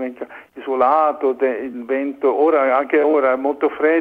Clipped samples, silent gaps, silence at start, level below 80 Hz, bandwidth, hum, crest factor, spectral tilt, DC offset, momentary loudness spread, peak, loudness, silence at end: under 0.1%; none; 0 s; -64 dBFS; 4.7 kHz; none; 14 dB; -6.5 dB/octave; under 0.1%; 12 LU; -4 dBFS; -18 LUFS; 0 s